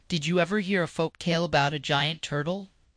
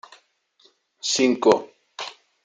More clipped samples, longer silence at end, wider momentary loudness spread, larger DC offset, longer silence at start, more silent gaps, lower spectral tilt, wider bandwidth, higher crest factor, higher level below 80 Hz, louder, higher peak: neither; about the same, 0.3 s vs 0.35 s; second, 6 LU vs 18 LU; neither; second, 0.1 s vs 1.05 s; neither; first, -5 dB/octave vs -2.5 dB/octave; about the same, 10.5 kHz vs 9.6 kHz; about the same, 20 dB vs 22 dB; first, -58 dBFS vs -72 dBFS; second, -27 LUFS vs -21 LUFS; second, -8 dBFS vs -2 dBFS